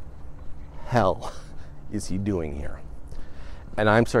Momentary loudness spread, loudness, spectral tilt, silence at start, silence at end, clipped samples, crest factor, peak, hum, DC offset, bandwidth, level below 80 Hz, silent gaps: 24 LU; -26 LUFS; -6.5 dB/octave; 0 s; 0 s; under 0.1%; 20 dB; -6 dBFS; none; under 0.1%; 12.5 kHz; -38 dBFS; none